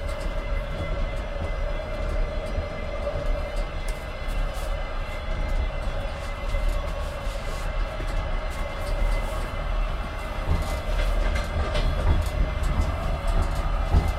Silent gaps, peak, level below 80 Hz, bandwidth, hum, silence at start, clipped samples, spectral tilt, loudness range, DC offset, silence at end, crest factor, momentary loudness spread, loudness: none; -8 dBFS; -26 dBFS; 13 kHz; none; 0 s; under 0.1%; -6 dB/octave; 4 LU; under 0.1%; 0 s; 18 dB; 6 LU; -30 LUFS